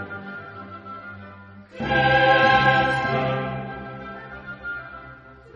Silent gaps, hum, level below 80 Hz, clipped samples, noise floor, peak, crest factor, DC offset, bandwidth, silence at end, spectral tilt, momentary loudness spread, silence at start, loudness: none; none; -48 dBFS; under 0.1%; -44 dBFS; -4 dBFS; 20 dB; under 0.1%; 8 kHz; 0.05 s; -2.5 dB/octave; 23 LU; 0 s; -20 LUFS